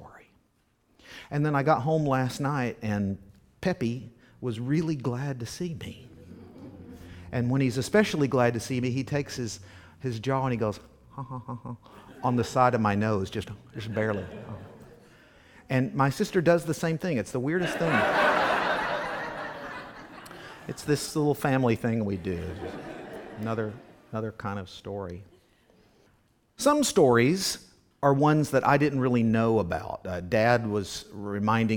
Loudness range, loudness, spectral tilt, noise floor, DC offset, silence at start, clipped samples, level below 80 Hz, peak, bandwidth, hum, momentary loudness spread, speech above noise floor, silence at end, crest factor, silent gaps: 8 LU; -27 LUFS; -6 dB/octave; -69 dBFS; under 0.1%; 0 s; under 0.1%; -56 dBFS; -6 dBFS; 19 kHz; none; 19 LU; 42 dB; 0 s; 22 dB; none